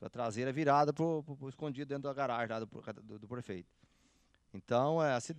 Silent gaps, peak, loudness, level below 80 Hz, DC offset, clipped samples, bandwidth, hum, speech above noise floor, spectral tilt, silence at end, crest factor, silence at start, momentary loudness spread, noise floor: none; -16 dBFS; -35 LUFS; -76 dBFS; under 0.1%; under 0.1%; 11 kHz; none; 35 dB; -6 dB/octave; 0 s; 20 dB; 0 s; 18 LU; -71 dBFS